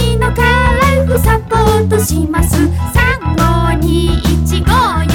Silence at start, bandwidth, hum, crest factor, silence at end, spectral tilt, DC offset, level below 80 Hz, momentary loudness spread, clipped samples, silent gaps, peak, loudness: 0 s; 18 kHz; none; 8 dB; 0 s; -5.5 dB/octave; under 0.1%; -18 dBFS; 3 LU; under 0.1%; none; -2 dBFS; -12 LUFS